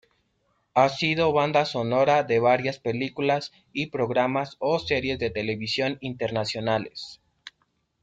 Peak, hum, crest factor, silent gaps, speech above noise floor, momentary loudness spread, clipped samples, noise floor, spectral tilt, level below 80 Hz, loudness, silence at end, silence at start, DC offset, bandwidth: -6 dBFS; none; 20 dB; none; 47 dB; 9 LU; under 0.1%; -72 dBFS; -5.5 dB/octave; -60 dBFS; -25 LUFS; 0.55 s; 0.75 s; under 0.1%; 9.2 kHz